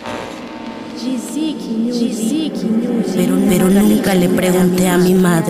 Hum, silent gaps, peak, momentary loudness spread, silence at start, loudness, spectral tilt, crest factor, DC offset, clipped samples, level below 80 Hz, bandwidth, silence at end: none; none; -4 dBFS; 14 LU; 0 s; -15 LUFS; -6 dB/octave; 10 dB; under 0.1%; under 0.1%; -44 dBFS; 16 kHz; 0 s